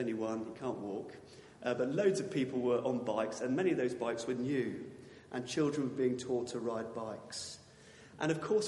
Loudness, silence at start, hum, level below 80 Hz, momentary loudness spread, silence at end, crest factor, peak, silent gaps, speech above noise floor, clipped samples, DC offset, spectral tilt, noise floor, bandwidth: -36 LUFS; 0 s; none; -76 dBFS; 14 LU; 0 s; 18 dB; -18 dBFS; none; 22 dB; under 0.1%; under 0.1%; -5.5 dB/octave; -58 dBFS; 11.5 kHz